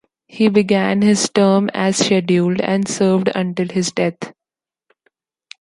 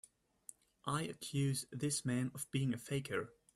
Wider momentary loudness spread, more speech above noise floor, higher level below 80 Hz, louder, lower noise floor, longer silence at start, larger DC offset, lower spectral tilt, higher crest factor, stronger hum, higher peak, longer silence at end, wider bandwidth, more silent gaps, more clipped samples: second, 6 LU vs 19 LU; first, 72 dB vs 22 dB; first, -58 dBFS vs -72 dBFS; first, -16 LUFS vs -40 LUFS; first, -88 dBFS vs -61 dBFS; second, 0.35 s vs 0.85 s; neither; about the same, -5 dB/octave vs -5 dB/octave; about the same, 16 dB vs 18 dB; neither; first, -2 dBFS vs -22 dBFS; first, 1.3 s vs 0.25 s; second, 11.5 kHz vs 14 kHz; neither; neither